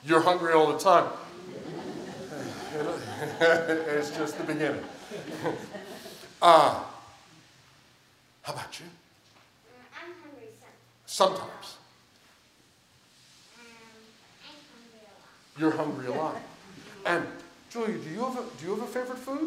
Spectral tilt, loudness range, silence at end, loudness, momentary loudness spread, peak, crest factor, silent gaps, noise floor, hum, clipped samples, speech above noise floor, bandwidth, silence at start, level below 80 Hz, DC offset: -4.5 dB/octave; 18 LU; 0 s; -27 LUFS; 23 LU; -2 dBFS; 28 dB; none; -62 dBFS; none; under 0.1%; 35 dB; 16 kHz; 0.05 s; -74 dBFS; under 0.1%